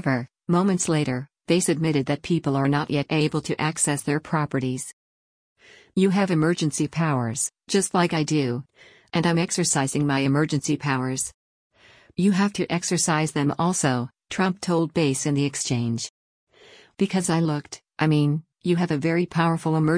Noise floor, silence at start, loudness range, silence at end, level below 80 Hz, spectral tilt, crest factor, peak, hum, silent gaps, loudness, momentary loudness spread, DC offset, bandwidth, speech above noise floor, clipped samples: -52 dBFS; 0 s; 2 LU; 0 s; -60 dBFS; -5 dB/octave; 16 dB; -8 dBFS; none; 4.93-5.56 s, 11.34-11.70 s, 16.10-16.47 s; -23 LUFS; 7 LU; under 0.1%; 10.5 kHz; 29 dB; under 0.1%